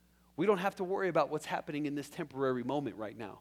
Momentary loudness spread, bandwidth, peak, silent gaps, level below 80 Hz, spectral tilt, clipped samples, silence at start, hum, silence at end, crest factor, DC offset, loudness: 11 LU; 15.5 kHz; -16 dBFS; none; -72 dBFS; -6 dB/octave; under 0.1%; 0.4 s; none; 0 s; 20 dB; under 0.1%; -35 LUFS